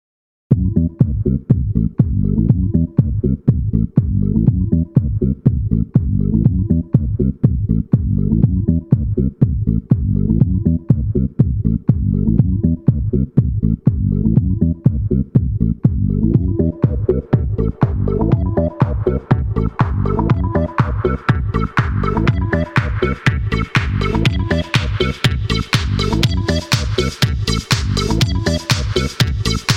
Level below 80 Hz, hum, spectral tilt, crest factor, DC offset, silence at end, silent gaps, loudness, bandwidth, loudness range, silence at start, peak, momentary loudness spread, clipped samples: -24 dBFS; none; -6.5 dB/octave; 14 dB; under 0.1%; 0 s; none; -17 LUFS; 15.5 kHz; 1 LU; 0.5 s; 0 dBFS; 3 LU; under 0.1%